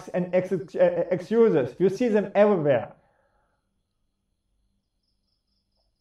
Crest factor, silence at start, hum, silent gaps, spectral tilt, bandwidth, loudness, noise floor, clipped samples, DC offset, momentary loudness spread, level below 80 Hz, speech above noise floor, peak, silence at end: 18 dB; 0 s; none; none; -8 dB/octave; 11 kHz; -23 LUFS; -75 dBFS; under 0.1%; under 0.1%; 6 LU; -68 dBFS; 53 dB; -8 dBFS; 3.1 s